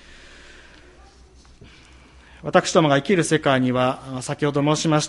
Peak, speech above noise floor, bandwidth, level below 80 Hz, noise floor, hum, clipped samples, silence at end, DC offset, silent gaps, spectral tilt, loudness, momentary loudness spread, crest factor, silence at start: -2 dBFS; 30 dB; 11.5 kHz; -52 dBFS; -49 dBFS; none; under 0.1%; 0 s; under 0.1%; none; -5 dB/octave; -20 LUFS; 9 LU; 20 dB; 2.45 s